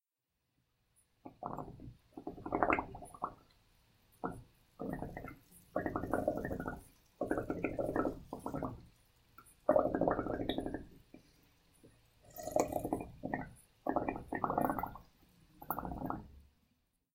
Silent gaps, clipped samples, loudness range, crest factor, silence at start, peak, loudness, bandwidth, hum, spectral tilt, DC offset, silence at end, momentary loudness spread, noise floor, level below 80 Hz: none; under 0.1%; 5 LU; 30 dB; 1.25 s; -10 dBFS; -39 LUFS; 16 kHz; none; -6 dB/octave; under 0.1%; 0.75 s; 19 LU; -87 dBFS; -58 dBFS